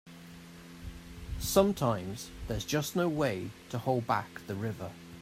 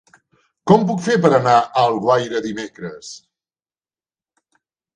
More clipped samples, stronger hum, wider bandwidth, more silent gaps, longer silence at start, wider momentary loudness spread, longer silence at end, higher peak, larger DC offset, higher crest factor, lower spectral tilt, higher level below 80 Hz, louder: neither; neither; first, 16 kHz vs 10 kHz; neither; second, 0.05 s vs 0.65 s; first, 20 LU vs 17 LU; second, 0 s vs 1.75 s; second, -10 dBFS vs 0 dBFS; neither; about the same, 22 dB vs 20 dB; about the same, -5 dB/octave vs -6 dB/octave; first, -50 dBFS vs -60 dBFS; second, -32 LUFS vs -16 LUFS